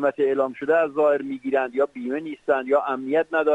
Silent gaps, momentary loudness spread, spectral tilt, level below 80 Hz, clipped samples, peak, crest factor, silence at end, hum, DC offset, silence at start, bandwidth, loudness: none; 5 LU; -6.5 dB/octave; -70 dBFS; under 0.1%; -8 dBFS; 14 dB; 0 s; none; under 0.1%; 0 s; 8 kHz; -23 LUFS